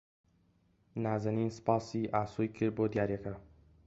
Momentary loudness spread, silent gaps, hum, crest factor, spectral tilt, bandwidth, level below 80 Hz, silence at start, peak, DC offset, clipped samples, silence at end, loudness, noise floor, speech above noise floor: 9 LU; none; none; 22 dB; -8 dB/octave; 8 kHz; -62 dBFS; 0.95 s; -14 dBFS; under 0.1%; under 0.1%; 0.4 s; -34 LUFS; -71 dBFS; 37 dB